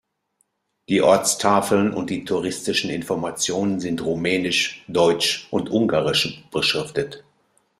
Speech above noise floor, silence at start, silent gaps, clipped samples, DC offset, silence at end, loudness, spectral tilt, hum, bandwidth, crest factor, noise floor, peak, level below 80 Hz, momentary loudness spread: 49 dB; 0.9 s; none; under 0.1%; under 0.1%; 0.6 s; -21 LUFS; -3.5 dB/octave; none; 15.5 kHz; 20 dB; -70 dBFS; -2 dBFS; -58 dBFS; 8 LU